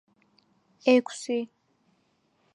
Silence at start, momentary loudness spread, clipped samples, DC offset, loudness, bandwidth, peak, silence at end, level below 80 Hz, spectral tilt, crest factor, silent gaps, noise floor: 0.85 s; 10 LU; under 0.1%; under 0.1%; -26 LUFS; 11 kHz; -8 dBFS; 1.1 s; -88 dBFS; -3.5 dB/octave; 22 dB; none; -70 dBFS